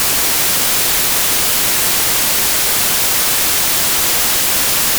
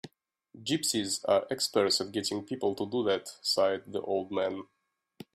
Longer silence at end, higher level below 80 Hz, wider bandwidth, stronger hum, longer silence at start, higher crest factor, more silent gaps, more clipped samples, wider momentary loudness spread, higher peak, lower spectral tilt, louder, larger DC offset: second, 0 s vs 0.7 s; first, -40 dBFS vs -74 dBFS; first, over 20 kHz vs 15.5 kHz; neither; about the same, 0 s vs 0.05 s; second, 10 dB vs 20 dB; neither; neither; second, 0 LU vs 6 LU; first, -4 dBFS vs -12 dBFS; second, 0 dB/octave vs -3 dB/octave; first, -10 LUFS vs -30 LUFS; neither